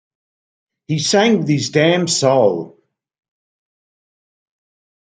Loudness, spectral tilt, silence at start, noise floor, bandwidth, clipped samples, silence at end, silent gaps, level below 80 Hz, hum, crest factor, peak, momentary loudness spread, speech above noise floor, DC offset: -15 LUFS; -4.5 dB/octave; 0.9 s; under -90 dBFS; 9.6 kHz; under 0.1%; 2.35 s; none; -62 dBFS; none; 18 dB; -2 dBFS; 10 LU; over 75 dB; under 0.1%